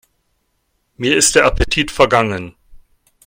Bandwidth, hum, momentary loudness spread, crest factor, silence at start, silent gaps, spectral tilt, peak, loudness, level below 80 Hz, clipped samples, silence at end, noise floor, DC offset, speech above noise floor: 16.5 kHz; none; 12 LU; 18 dB; 1 s; none; -3 dB/octave; 0 dBFS; -14 LUFS; -30 dBFS; under 0.1%; 0.5 s; -66 dBFS; under 0.1%; 52 dB